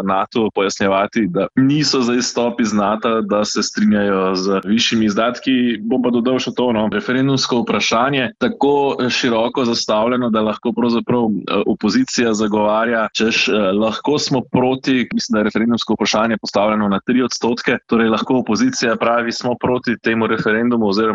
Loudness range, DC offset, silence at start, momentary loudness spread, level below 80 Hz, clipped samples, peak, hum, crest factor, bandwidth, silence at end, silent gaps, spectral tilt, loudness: 1 LU; under 0.1%; 0 s; 3 LU; -52 dBFS; under 0.1%; -4 dBFS; none; 14 dB; 7.8 kHz; 0 s; none; -4.5 dB/octave; -17 LUFS